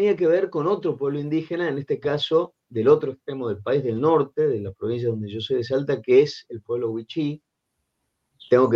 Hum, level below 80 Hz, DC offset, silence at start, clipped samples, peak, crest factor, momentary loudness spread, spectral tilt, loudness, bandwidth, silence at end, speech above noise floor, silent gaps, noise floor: none; -66 dBFS; under 0.1%; 0 s; under 0.1%; -6 dBFS; 18 dB; 10 LU; -7.5 dB/octave; -23 LUFS; 7.2 kHz; 0 s; 55 dB; none; -77 dBFS